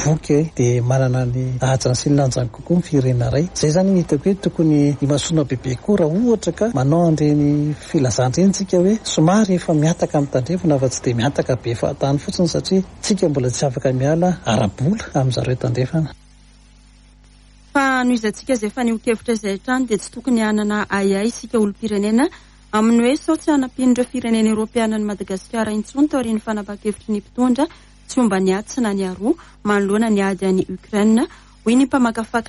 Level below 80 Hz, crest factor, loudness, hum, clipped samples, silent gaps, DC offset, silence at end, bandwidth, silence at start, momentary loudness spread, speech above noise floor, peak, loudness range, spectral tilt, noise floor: -44 dBFS; 14 dB; -18 LUFS; none; under 0.1%; none; under 0.1%; 0 s; 11.5 kHz; 0 s; 6 LU; 29 dB; -4 dBFS; 4 LU; -6 dB/octave; -47 dBFS